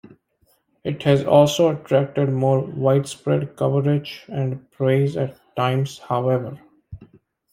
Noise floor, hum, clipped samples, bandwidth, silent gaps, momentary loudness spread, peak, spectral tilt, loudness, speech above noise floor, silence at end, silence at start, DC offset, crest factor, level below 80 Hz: -64 dBFS; none; under 0.1%; 15.5 kHz; none; 12 LU; -2 dBFS; -7 dB/octave; -21 LUFS; 44 dB; 0.55 s; 0.85 s; under 0.1%; 18 dB; -58 dBFS